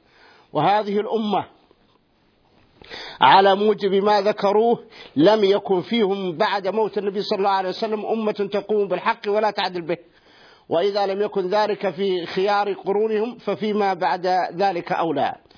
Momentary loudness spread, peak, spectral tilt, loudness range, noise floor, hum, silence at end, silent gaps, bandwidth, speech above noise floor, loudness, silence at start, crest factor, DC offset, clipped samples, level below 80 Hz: 8 LU; 0 dBFS; -6.5 dB/octave; 5 LU; -61 dBFS; none; 0.25 s; none; 5.4 kHz; 41 dB; -21 LUFS; 0.55 s; 20 dB; under 0.1%; under 0.1%; -70 dBFS